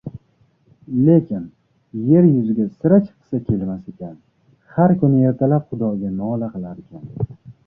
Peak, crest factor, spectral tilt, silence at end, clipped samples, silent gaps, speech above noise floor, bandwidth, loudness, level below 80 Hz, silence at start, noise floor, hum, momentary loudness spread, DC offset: -2 dBFS; 16 dB; -13.5 dB/octave; 0.15 s; under 0.1%; none; 42 dB; 3 kHz; -18 LUFS; -50 dBFS; 0.05 s; -59 dBFS; none; 20 LU; under 0.1%